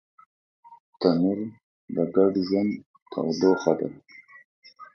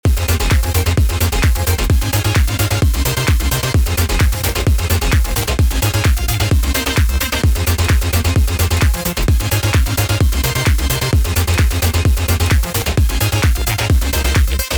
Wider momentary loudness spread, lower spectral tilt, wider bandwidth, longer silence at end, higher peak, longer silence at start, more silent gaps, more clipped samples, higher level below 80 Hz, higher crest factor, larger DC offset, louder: first, 13 LU vs 1 LU; first, -7 dB/octave vs -4.5 dB/octave; second, 6.6 kHz vs over 20 kHz; about the same, 0.1 s vs 0 s; about the same, -4 dBFS vs -2 dBFS; first, 0.7 s vs 0.05 s; first, 0.80-0.93 s, 1.63-1.88 s, 2.86-2.94 s, 3.02-3.06 s, 4.45-4.62 s vs none; neither; second, -66 dBFS vs -18 dBFS; first, 22 dB vs 12 dB; neither; second, -25 LUFS vs -15 LUFS